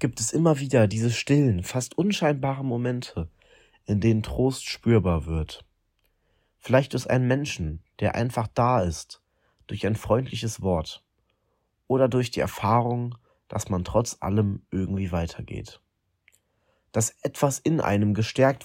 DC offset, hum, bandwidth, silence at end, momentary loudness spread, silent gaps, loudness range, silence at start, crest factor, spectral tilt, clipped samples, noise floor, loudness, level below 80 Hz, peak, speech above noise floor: under 0.1%; none; 16 kHz; 0 s; 14 LU; none; 4 LU; 0 s; 20 dB; -6 dB/octave; under 0.1%; -73 dBFS; -25 LUFS; -48 dBFS; -6 dBFS; 49 dB